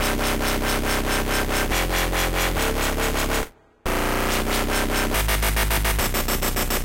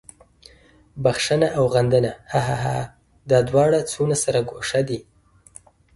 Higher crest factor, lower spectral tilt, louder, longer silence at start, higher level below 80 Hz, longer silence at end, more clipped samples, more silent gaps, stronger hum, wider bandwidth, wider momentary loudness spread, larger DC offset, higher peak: second, 12 dB vs 18 dB; second, -3 dB/octave vs -5 dB/octave; about the same, -22 LUFS vs -21 LUFS; second, 0 s vs 0.95 s; first, -26 dBFS vs -50 dBFS; second, 0 s vs 0.95 s; neither; neither; neither; first, 17 kHz vs 11.5 kHz; second, 2 LU vs 8 LU; first, 0.3% vs under 0.1%; second, -10 dBFS vs -4 dBFS